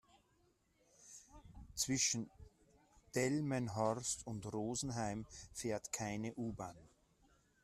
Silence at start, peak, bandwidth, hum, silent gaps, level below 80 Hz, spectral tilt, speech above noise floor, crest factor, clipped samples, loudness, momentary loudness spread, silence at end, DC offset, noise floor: 1 s; -24 dBFS; 14 kHz; none; none; -66 dBFS; -4 dB/octave; 35 dB; 20 dB; under 0.1%; -40 LUFS; 20 LU; 0.75 s; under 0.1%; -76 dBFS